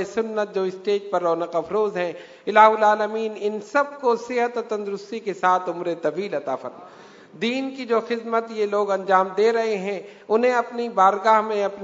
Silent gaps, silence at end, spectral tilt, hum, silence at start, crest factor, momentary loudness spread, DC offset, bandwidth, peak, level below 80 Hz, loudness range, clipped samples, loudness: none; 0 s; -5 dB/octave; none; 0 s; 22 dB; 10 LU; under 0.1%; 7.8 kHz; 0 dBFS; -74 dBFS; 5 LU; under 0.1%; -22 LUFS